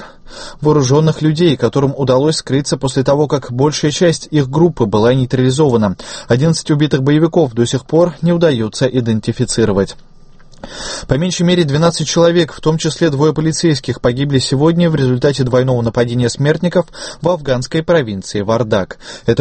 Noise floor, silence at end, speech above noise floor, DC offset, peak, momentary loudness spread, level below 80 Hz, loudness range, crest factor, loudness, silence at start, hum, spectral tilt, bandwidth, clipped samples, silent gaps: -38 dBFS; 0 s; 25 dB; under 0.1%; 0 dBFS; 6 LU; -38 dBFS; 2 LU; 14 dB; -14 LUFS; 0 s; none; -6 dB/octave; 8.8 kHz; under 0.1%; none